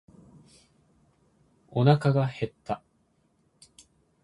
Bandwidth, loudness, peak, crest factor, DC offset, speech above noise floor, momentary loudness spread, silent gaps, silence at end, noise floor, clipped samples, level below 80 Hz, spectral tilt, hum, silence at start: 11 kHz; -26 LUFS; -4 dBFS; 26 dB; under 0.1%; 45 dB; 14 LU; none; 1.45 s; -69 dBFS; under 0.1%; -64 dBFS; -8 dB/octave; none; 1.75 s